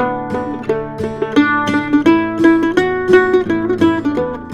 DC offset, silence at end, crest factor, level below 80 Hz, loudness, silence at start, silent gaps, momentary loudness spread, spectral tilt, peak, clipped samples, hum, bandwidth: under 0.1%; 0 s; 14 dB; -44 dBFS; -15 LUFS; 0 s; none; 9 LU; -6.5 dB/octave; 0 dBFS; under 0.1%; none; 9.8 kHz